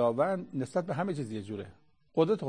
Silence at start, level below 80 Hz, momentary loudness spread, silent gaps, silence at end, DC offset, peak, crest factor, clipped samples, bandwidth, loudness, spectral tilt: 0 s; -70 dBFS; 13 LU; none; 0 s; under 0.1%; -12 dBFS; 18 dB; under 0.1%; 9.8 kHz; -33 LUFS; -7.5 dB/octave